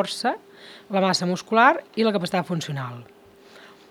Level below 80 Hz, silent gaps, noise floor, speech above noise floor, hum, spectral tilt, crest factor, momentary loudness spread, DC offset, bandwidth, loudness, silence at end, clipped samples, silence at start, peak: -74 dBFS; none; -49 dBFS; 26 dB; none; -4.5 dB/octave; 22 dB; 16 LU; under 0.1%; 16 kHz; -22 LUFS; 0.25 s; under 0.1%; 0 s; -2 dBFS